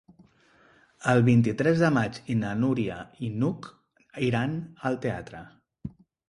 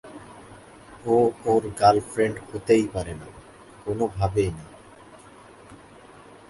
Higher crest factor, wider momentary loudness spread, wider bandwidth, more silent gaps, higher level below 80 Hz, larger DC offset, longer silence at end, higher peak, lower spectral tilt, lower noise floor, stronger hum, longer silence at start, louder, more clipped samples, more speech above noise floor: about the same, 18 dB vs 22 dB; second, 21 LU vs 24 LU; about the same, 11 kHz vs 11.5 kHz; neither; second, -58 dBFS vs -48 dBFS; neither; second, 0.4 s vs 0.75 s; second, -8 dBFS vs -4 dBFS; about the same, -7.5 dB/octave vs -6.5 dB/octave; first, -60 dBFS vs -48 dBFS; neither; first, 1 s vs 0.05 s; second, -26 LUFS vs -23 LUFS; neither; first, 35 dB vs 25 dB